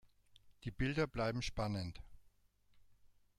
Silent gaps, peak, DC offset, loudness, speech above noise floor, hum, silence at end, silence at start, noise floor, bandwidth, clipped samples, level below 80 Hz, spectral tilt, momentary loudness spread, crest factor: none; -24 dBFS; under 0.1%; -40 LUFS; 32 dB; 50 Hz at -65 dBFS; 0.35 s; 0.35 s; -71 dBFS; 14 kHz; under 0.1%; -54 dBFS; -6 dB/octave; 13 LU; 18 dB